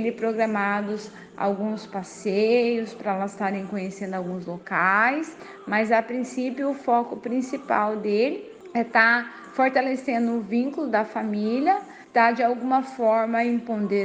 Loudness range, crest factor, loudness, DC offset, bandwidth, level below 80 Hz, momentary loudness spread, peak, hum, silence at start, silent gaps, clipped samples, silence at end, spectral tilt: 3 LU; 20 dB; -24 LUFS; under 0.1%; 9.4 kHz; -72 dBFS; 11 LU; -4 dBFS; none; 0 s; none; under 0.1%; 0 s; -6 dB/octave